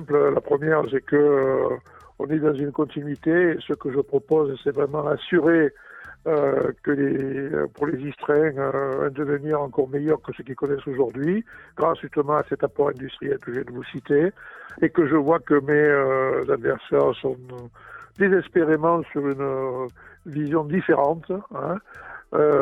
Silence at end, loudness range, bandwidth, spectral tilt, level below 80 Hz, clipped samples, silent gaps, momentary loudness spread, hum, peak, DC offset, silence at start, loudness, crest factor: 0 s; 4 LU; 4 kHz; -9 dB/octave; -58 dBFS; under 0.1%; none; 13 LU; none; -6 dBFS; under 0.1%; 0 s; -23 LUFS; 16 dB